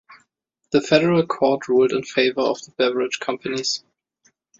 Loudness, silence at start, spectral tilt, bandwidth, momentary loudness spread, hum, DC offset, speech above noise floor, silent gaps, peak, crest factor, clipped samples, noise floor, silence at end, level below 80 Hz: -20 LUFS; 0.1 s; -4.5 dB/octave; 7.8 kHz; 8 LU; none; under 0.1%; 53 dB; none; -2 dBFS; 20 dB; under 0.1%; -73 dBFS; 0.8 s; -62 dBFS